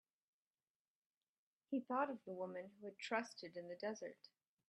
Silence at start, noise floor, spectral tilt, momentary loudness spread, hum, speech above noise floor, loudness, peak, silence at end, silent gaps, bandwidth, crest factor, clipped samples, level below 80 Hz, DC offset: 1.7 s; under -90 dBFS; -4.5 dB/octave; 11 LU; none; over 44 dB; -47 LUFS; -26 dBFS; 0.4 s; none; 11 kHz; 22 dB; under 0.1%; under -90 dBFS; under 0.1%